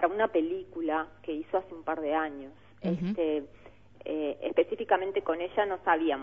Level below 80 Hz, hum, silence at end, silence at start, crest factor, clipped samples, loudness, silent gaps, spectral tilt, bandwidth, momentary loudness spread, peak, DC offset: -64 dBFS; 50 Hz at -60 dBFS; 0 s; 0 s; 20 dB; under 0.1%; -31 LUFS; none; -8.5 dB/octave; 5.4 kHz; 10 LU; -10 dBFS; 0.1%